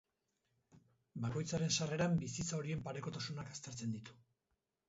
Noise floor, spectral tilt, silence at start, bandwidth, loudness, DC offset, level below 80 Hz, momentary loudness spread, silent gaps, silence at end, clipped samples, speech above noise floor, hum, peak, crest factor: -87 dBFS; -5.5 dB/octave; 0.75 s; 7.6 kHz; -40 LUFS; under 0.1%; -68 dBFS; 11 LU; none; 0.75 s; under 0.1%; 47 dB; none; -22 dBFS; 20 dB